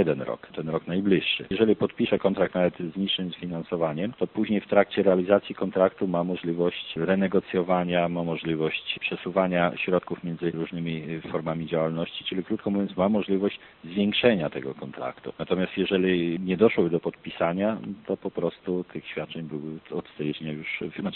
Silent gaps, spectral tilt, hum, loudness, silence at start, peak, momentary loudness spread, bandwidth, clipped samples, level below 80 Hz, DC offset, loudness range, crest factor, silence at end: none; -4.5 dB/octave; none; -26 LUFS; 0 s; -6 dBFS; 11 LU; 4.3 kHz; under 0.1%; -60 dBFS; under 0.1%; 4 LU; 20 dB; 0 s